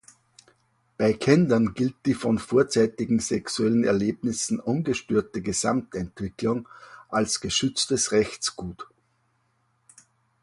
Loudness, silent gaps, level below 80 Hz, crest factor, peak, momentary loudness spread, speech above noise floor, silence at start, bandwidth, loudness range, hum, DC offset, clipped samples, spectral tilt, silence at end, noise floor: -25 LUFS; none; -54 dBFS; 22 dB; -4 dBFS; 11 LU; 45 dB; 1 s; 11.5 kHz; 4 LU; none; under 0.1%; under 0.1%; -4.5 dB/octave; 1.6 s; -69 dBFS